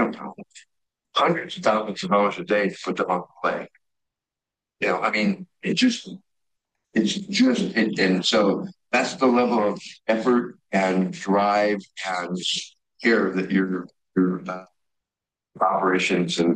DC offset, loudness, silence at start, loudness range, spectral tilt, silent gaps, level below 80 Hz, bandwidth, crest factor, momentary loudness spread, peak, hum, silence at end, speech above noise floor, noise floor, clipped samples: under 0.1%; -23 LUFS; 0 s; 4 LU; -5 dB/octave; none; -70 dBFS; 10 kHz; 16 dB; 9 LU; -6 dBFS; none; 0 s; 66 dB; -89 dBFS; under 0.1%